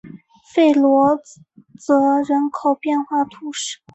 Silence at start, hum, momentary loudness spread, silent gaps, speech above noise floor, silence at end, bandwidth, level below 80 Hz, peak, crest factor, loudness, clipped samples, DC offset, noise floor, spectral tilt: 0.05 s; none; 12 LU; none; 24 dB; 0.2 s; 8.2 kHz; -64 dBFS; -4 dBFS; 16 dB; -18 LUFS; under 0.1%; under 0.1%; -41 dBFS; -4 dB/octave